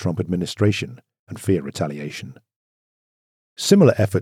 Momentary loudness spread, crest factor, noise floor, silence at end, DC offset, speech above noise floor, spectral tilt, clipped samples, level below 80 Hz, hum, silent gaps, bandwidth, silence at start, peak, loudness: 20 LU; 20 dB; under -90 dBFS; 0 s; under 0.1%; over 70 dB; -6 dB/octave; under 0.1%; -60 dBFS; none; 1.19-1.27 s, 2.56-3.56 s; 16 kHz; 0 s; -2 dBFS; -20 LUFS